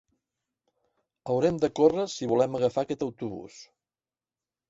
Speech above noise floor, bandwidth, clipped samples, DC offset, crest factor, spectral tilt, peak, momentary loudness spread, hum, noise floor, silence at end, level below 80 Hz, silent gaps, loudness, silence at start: over 64 dB; 7.8 kHz; under 0.1%; under 0.1%; 22 dB; -6 dB/octave; -8 dBFS; 16 LU; none; under -90 dBFS; 1.05 s; -64 dBFS; none; -27 LUFS; 1.25 s